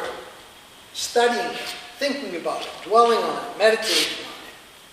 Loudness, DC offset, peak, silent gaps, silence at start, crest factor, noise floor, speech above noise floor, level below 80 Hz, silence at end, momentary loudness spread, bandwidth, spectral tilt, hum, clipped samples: -22 LUFS; under 0.1%; -2 dBFS; none; 0 s; 20 dB; -46 dBFS; 25 dB; -64 dBFS; 0.15 s; 18 LU; 15.5 kHz; -1.5 dB/octave; none; under 0.1%